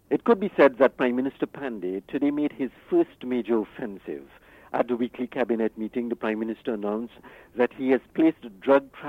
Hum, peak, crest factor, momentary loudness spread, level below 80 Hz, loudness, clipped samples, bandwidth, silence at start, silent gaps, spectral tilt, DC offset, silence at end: none; -6 dBFS; 20 dB; 12 LU; -64 dBFS; -26 LUFS; under 0.1%; 5.4 kHz; 0.1 s; none; -8 dB/octave; under 0.1%; 0 s